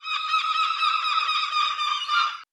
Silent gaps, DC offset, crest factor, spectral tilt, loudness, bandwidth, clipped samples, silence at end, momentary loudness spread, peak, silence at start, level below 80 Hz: none; under 0.1%; 14 dB; 4 dB/octave; -23 LUFS; 11.5 kHz; under 0.1%; 0.1 s; 2 LU; -10 dBFS; 0 s; -74 dBFS